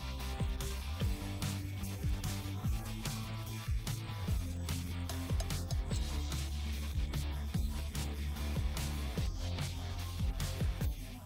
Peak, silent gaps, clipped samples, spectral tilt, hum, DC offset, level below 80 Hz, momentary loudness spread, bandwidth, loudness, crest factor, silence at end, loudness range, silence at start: -24 dBFS; none; under 0.1%; -5 dB/octave; none; under 0.1%; -40 dBFS; 3 LU; 16 kHz; -39 LUFS; 12 dB; 0 s; 1 LU; 0 s